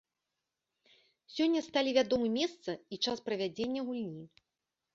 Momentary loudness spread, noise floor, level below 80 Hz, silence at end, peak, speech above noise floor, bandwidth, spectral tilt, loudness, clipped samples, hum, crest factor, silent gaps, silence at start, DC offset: 13 LU; -88 dBFS; -74 dBFS; 0.7 s; -14 dBFS; 55 dB; 7.6 kHz; -4.5 dB/octave; -33 LUFS; under 0.1%; none; 20 dB; none; 1.3 s; under 0.1%